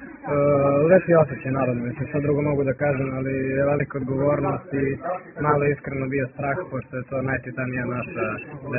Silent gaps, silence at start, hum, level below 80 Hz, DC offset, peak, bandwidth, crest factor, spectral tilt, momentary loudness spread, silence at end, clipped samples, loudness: none; 0 s; none; -52 dBFS; under 0.1%; -4 dBFS; 2.9 kHz; 20 dB; -11.5 dB/octave; 9 LU; 0 s; under 0.1%; -23 LUFS